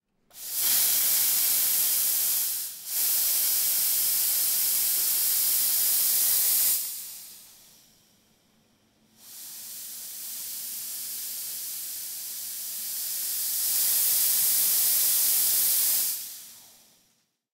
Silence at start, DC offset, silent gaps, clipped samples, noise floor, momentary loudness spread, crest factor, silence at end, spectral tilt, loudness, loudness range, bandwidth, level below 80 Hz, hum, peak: 0.35 s; under 0.1%; none; under 0.1%; -70 dBFS; 15 LU; 18 dB; 0.9 s; 3 dB/octave; -22 LUFS; 14 LU; 16 kHz; -72 dBFS; none; -10 dBFS